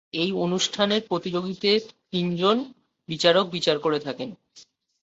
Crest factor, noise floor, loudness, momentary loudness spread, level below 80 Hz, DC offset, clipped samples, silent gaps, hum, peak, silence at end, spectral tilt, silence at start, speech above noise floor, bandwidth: 22 dB; -54 dBFS; -24 LUFS; 12 LU; -66 dBFS; under 0.1%; under 0.1%; none; none; -4 dBFS; 0.4 s; -4.5 dB/octave; 0.15 s; 30 dB; 8.2 kHz